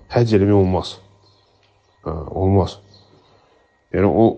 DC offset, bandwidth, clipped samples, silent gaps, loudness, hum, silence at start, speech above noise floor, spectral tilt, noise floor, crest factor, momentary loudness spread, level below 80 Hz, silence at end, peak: under 0.1%; 8.6 kHz; under 0.1%; none; -18 LUFS; none; 0.1 s; 42 dB; -8.5 dB/octave; -58 dBFS; 18 dB; 18 LU; -42 dBFS; 0 s; -2 dBFS